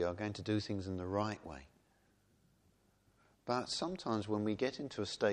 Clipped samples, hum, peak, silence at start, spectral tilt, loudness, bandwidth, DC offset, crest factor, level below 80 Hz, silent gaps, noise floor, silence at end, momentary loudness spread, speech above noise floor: under 0.1%; none; -20 dBFS; 0 s; -5.5 dB/octave; -39 LUFS; 10.5 kHz; under 0.1%; 20 dB; -68 dBFS; none; -73 dBFS; 0 s; 9 LU; 35 dB